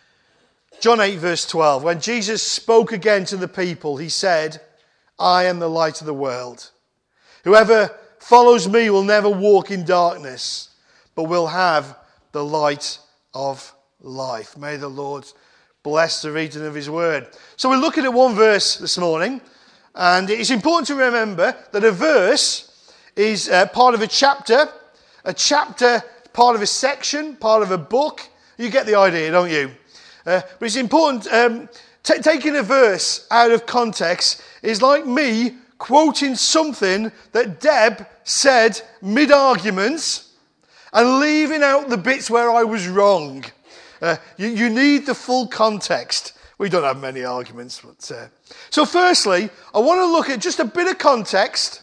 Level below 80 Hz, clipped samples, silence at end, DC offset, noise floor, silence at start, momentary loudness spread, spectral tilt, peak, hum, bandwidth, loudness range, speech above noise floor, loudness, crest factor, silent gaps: -64 dBFS; under 0.1%; 0.05 s; under 0.1%; -64 dBFS; 0.8 s; 14 LU; -3 dB/octave; 0 dBFS; none; 10.5 kHz; 7 LU; 47 dB; -17 LUFS; 18 dB; none